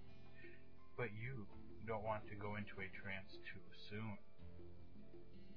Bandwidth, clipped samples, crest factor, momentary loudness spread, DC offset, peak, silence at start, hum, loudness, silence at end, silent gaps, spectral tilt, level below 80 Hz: 5.4 kHz; under 0.1%; 20 dB; 15 LU; 0.3%; -30 dBFS; 0 s; none; -51 LUFS; 0 s; none; -5 dB/octave; -70 dBFS